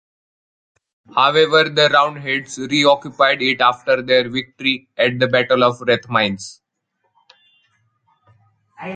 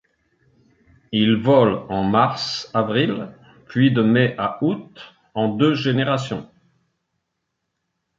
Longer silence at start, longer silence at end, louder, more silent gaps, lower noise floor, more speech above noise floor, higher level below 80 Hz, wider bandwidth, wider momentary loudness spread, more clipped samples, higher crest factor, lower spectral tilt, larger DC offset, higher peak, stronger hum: about the same, 1.15 s vs 1.1 s; second, 0 s vs 1.75 s; first, -16 LUFS vs -20 LUFS; neither; second, -71 dBFS vs -77 dBFS; second, 54 dB vs 58 dB; about the same, -60 dBFS vs -56 dBFS; first, 9.4 kHz vs 7.6 kHz; second, 9 LU vs 13 LU; neither; about the same, 18 dB vs 18 dB; second, -4 dB/octave vs -7 dB/octave; neither; about the same, 0 dBFS vs -2 dBFS; neither